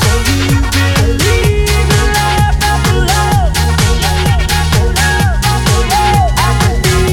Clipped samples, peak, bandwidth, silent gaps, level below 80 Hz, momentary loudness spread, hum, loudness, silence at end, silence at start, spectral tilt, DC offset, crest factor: under 0.1%; 0 dBFS; 19 kHz; none; -16 dBFS; 1 LU; none; -11 LUFS; 0 s; 0 s; -4.5 dB/octave; under 0.1%; 10 dB